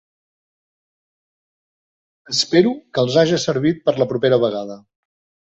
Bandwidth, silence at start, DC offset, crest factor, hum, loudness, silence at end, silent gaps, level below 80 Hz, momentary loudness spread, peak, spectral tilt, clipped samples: 8.2 kHz; 2.3 s; under 0.1%; 18 dB; none; -18 LUFS; 0.8 s; none; -60 dBFS; 6 LU; -2 dBFS; -5 dB/octave; under 0.1%